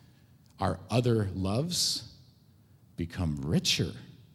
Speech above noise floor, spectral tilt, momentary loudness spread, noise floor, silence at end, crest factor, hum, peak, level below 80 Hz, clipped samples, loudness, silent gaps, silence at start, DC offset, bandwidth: 30 dB; -4.5 dB/octave; 13 LU; -60 dBFS; 0.15 s; 20 dB; none; -12 dBFS; -52 dBFS; under 0.1%; -30 LUFS; none; 0.6 s; under 0.1%; 16 kHz